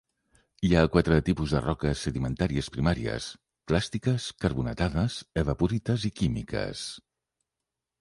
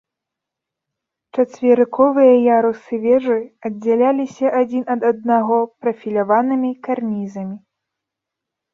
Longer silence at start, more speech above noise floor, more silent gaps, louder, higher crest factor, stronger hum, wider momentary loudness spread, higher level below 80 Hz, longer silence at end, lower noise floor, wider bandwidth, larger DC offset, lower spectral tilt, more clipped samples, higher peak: second, 0.6 s vs 1.35 s; second, 60 dB vs 67 dB; neither; second, -28 LUFS vs -17 LUFS; first, 22 dB vs 16 dB; neither; about the same, 10 LU vs 12 LU; first, -40 dBFS vs -66 dBFS; second, 1 s vs 1.15 s; first, -87 dBFS vs -83 dBFS; first, 11.5 kHz vs 7 kHz; neither; second, -6.5 dB/octave vs -8 dB/octave; neither; second, -6 dBFS vs -2 dBFS